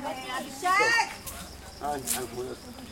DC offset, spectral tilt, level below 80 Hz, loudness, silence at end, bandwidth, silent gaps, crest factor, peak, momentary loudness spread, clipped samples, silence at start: under 0.1%; -2 dB/octave; -54 dBFS; -28 LUFS; 0 s; 17 kHz; none; 22 dB; -8 dBFS; 18 LU; under 0.1%; 0 s